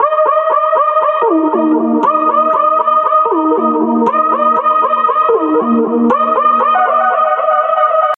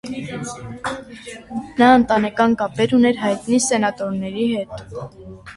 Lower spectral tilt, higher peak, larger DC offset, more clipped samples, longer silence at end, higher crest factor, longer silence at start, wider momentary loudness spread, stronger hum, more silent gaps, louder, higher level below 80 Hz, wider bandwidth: first, -7.5 dB/octave vs -4.5 dB/octave; about the same, -2 dBFS vs -2 dBFS; neither; neither; about the same, 0 s vs 0 s; second, 10 dB vs 18 dB; about the same, 0 s vs 0.05 s; second, 2 LU vs 19 LU; neither; neither; first, -11 LUFS vs -18 LUFS; second, -66 dBFS vs -50 dBFS; second, 4 kHz vs 11.5 kHz